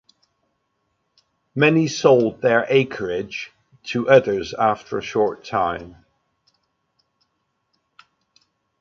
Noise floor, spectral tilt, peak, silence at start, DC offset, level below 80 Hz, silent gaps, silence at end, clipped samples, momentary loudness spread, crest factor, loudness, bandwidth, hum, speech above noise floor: -72 dBFS; -5.5 dB/octave; -2 dBFS; 1.55 s; under 0.1%; -58 dBFS; none; 2.9 s; under 0.1%; 16 LU; 20 dB; -19 LUFS; 7.6 kHz; none; 54 dB